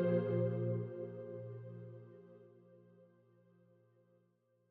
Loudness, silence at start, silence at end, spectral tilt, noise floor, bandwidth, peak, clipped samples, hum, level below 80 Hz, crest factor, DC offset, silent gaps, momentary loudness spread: -40 LUFS; 0 s; 1.65 s; -9.5 dB/octave; -76 dBFS; 4.1 kHz; -24 dBFS; under 0.1%; 60 Hz at -90 dBFS; under -90 dBFS; 18 dB; under 0.1%; none; 25 LU